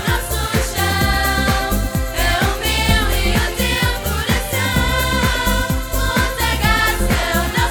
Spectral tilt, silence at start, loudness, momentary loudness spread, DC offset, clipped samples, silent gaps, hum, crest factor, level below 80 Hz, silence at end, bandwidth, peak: -4 dB/octave; 0 s; -17 LUFS; 4 LU; under 0.1%; under 0.1%; none; none; 14 dB; -22 dBFS; 0 s; over 20 kHz; -2 dBFS